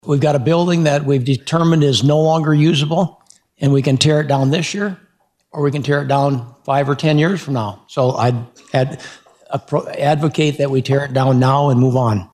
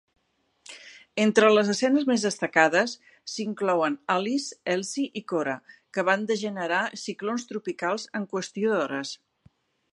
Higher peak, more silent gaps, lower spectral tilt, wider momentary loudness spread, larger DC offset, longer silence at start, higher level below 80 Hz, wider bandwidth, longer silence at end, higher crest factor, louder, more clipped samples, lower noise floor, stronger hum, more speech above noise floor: about the same, 0 dBFS vs -2 dBFS; neither; first, -6.5 dB/octave vs -4 dB/octave; second, 9 LU vs 15 LU; neither; second, 0.05 s vs 0.7 s; first, -54 dBFS vs -78 dBFS; about the same, 11 kHz vs 11.5 kHz; second, 0.1 s vs 0.75 s; second, 14 dB vs 24 dB; first, -16 LUFS vs -26 LUFS; neither; second, -58 dBFS vs -70 dBFS; neither; about the same, 43 dB vs 45 dB